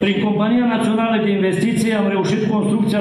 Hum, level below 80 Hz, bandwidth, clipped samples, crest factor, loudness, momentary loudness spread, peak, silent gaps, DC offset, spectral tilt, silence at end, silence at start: none; -56 dBFS; 13 kHz; under 0.1%; 12 dB; -17 LUFS; 1 LU; -6 dBFS; none; under 0.1%; -6.5 dB/octave; 0 s; 0 s